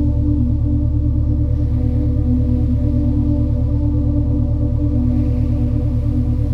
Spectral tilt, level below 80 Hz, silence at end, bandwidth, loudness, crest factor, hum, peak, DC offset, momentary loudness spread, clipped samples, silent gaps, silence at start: -11.5 dB/octave; -20 dBFS; 0 s; 2.6 kHz; -18 LUFS; 12 dB; none; -4 dBFS; under 0.1%; 1 LU; under 0.1%; none; 0 s